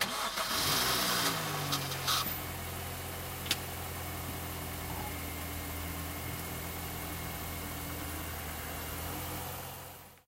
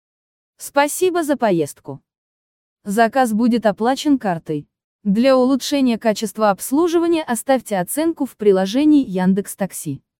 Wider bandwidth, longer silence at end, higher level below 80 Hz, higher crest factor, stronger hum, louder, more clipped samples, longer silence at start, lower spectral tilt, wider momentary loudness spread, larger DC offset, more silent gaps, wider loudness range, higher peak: about the same, 16 kHz vs 17.5 kHz; about the same, 0.1 s vs 0.2 s; first, -50 dBFS vs -60 dBFS; first, 22 dB vs 16 dB; neither; second, -35 LUFS vs -18 LUFS; neither; second, 0 s vs 0.6 s; second, -2.5 dB/octave vs -5 dB/octave; about the same, 10 LU vs 12 LU; neither; second, none vs 2.18-2.76 s, 4.84-4.99 s; first, 7 LU vs 2 LU; second, -14 dBFS vs -2 dBFS